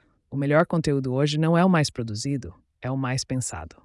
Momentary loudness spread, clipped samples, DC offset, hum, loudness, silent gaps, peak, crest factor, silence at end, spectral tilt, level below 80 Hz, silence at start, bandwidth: 12 LU; under 0.1%; under 0.1%; none; -24 LUFS; none; -8 dBFS; 16 dB; 0.15 s; -6 dB/octave; -54 dBFS; 0.3 s; 12 kHz